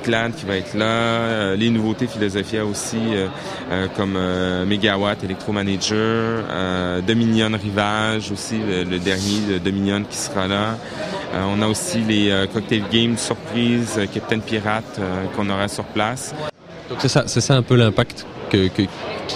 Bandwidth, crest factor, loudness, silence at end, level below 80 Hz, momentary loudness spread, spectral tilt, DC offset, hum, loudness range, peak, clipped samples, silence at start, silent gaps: 14.5 kHz; 20 dB; -20 LUFS; 0 s; -48 dBFS; 7 LU; -5 dB/octave; under 0.1%; none; 2 LU; 0 dBFS; under 0.1%; 0 s; none